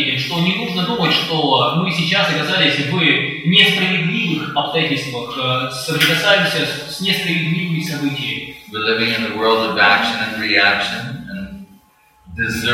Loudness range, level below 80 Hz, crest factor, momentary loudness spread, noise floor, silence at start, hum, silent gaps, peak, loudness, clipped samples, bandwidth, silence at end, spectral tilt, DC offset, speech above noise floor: 3 LU; -52 dBFS; 18 dB; 10 LU; -52 dBFS; 0 s; none; none; 0 dBFS; -16 LUFS; under 0.1%; 16.5 kHz; 0 s; -4.5 dB/octave; under 0.1%; 35 dB